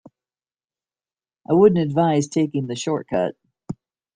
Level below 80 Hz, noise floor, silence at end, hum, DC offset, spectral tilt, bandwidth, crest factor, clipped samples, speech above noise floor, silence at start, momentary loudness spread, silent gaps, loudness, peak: -60 dBFS; under -90 dBFS; 0.4 s; none; under 0.1%; -6.5 dB/octave; 9.8 kHz; 18 dB; under 0.1%; over 71 dB; 1.5 s; 21 LU; none; -20 LUFS; -4 dBFS